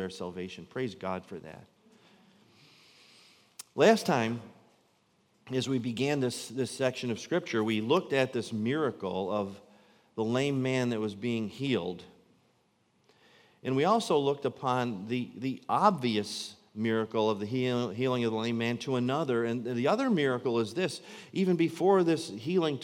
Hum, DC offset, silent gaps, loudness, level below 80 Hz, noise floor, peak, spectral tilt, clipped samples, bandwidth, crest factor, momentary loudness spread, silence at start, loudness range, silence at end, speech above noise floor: none; under 0.1%; none; -30 LUFS; -78 dBFS; -70 dBFS; -8 dBFS; -5.5 dB/octave; under 0.1%; 16.5 kHz; 22 dB; 12 LU; 0 s; 4 LU; 0 s; 41 dB